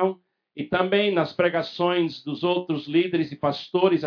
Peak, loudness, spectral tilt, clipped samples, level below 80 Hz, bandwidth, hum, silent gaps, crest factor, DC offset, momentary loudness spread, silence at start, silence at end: -6 dBFS; -24 LUFS; -7.5 dB/octave; under 0.1%; -66 dBFS; 5.4 kHz; none; none; 16 dB; under 0.1%; 7 LU; 0 s; 0 s